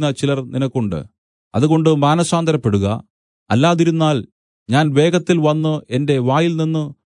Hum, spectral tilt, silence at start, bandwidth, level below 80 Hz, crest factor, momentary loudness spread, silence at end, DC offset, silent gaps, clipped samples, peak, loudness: none; -6.5 dB/octave; 0 s; 11 kHz; -56 dBFS; 16 dB; 8 LU; 0.15 s; under 0.1%; 1.18-1.51 s, 3.10-3.46 s, 4.32-4.66 s; under 0.1%; -2 dBFS; -17 LUFS